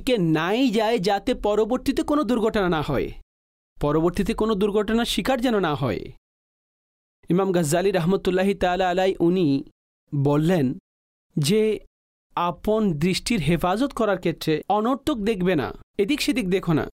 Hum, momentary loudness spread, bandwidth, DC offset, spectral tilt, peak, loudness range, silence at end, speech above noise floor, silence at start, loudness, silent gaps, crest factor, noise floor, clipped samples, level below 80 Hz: none; 6 LU; 16 kHz; under 0.1%; -6 dB/octave; -12 dBFS; 2 LU; 0 s; over 68 dB; 0 s; -23 LUFS; 3.23-3.76 s, 6.18-7.23 s, 9.72-10.07 s, 10.80-11.30 s, 11.87-12.30 s, 15.83-15.94 s; 12 dB; under -90 dBFS; under 0.1%; -44 dBFS